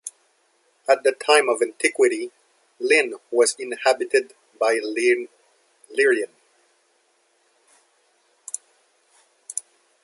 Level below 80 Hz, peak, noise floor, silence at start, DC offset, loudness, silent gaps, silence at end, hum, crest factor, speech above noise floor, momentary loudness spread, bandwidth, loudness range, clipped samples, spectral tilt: -82 dBFS; -2 dBFS; -65 dBFS; 0.05 s; under 0.1%; -21 LUFS; none; 0.45 s; none; 22 dB; 44 dB; 16 LU; 11.5 kHz; 18 LU; under 0.1%; -0.5 dB/octave